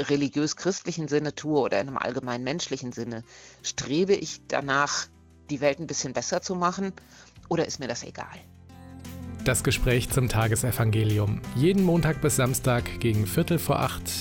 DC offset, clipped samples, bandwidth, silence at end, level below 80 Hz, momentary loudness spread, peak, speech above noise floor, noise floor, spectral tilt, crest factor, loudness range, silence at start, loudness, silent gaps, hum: under 0.1%; under 0.1%; 17 kHz; 0 s; -44 dBFS; 11 LU; -10 dBFS; 20 dB; -46 dBFS; -5 dB/octave; 18 dB; 6 LU; 0 s; -26 LUFS; none; none